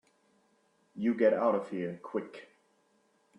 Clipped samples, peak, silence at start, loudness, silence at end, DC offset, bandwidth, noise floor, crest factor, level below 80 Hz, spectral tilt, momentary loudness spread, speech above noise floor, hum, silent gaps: under 0.1%; -14 dBFS; 0.95 s; -31 LUFS; 1 s; under 0.1%; 9.6 kHz; -71 dBFS; 20 dB; -80 dBFS; -8 dB/octave; 22 LU; 41 dB; none; none